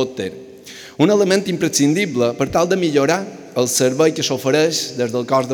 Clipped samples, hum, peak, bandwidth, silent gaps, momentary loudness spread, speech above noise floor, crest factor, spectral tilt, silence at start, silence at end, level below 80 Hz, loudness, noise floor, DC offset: under 0.1%; none; -2 dBFS; 19.5 kHz; none; 12 LU; 21 dB; 16 dB; -4 dB/octave; 0 s; 0 s; -56 dBFS; -17 LUFS; -38 dBFS; under 0.1%